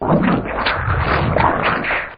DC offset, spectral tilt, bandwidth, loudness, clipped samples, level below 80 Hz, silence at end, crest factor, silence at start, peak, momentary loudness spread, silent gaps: under 0.1%; -11.5 dB/octave; 5.4 kHz; -17 LUFS; under 0.1%; -30 dBFS; 0 s; 14 dB; 0 s; -2 dBFS; 3 LU; none